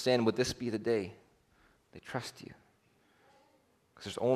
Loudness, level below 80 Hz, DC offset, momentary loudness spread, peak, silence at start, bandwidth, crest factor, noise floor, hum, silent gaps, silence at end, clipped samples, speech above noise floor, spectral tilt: -35 LUFS; -68 dBFS; under 0.1%; 23 LU; -16 dBFS; 0 s; 13.5 kHz; 20 dB; -70 dBFS; none; none; 0 s; under 0.1%; 37 dB; -5 dB/octave